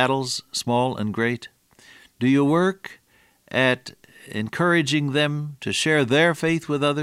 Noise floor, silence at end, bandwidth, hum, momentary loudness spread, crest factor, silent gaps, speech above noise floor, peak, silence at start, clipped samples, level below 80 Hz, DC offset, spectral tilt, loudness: -58 dBFS; 0 s; 15.5 kHz; none; 11 LU; 20 dB; none; 37 dB; -4 dBFS; 0 s; under 0.1%; -62 dBFS; under 0.1%; -5 dB/octave; -22 LUFS